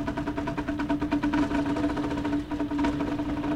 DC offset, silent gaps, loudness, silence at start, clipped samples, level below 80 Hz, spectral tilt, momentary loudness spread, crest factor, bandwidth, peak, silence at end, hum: under 0.1%; none; -28 LUFS; 0 s; under 0.1%; -42 dBFS; -7 dB/octave; 5 LU; 14 dB; 9.8 kHz; -14 dBFS; 0 s; none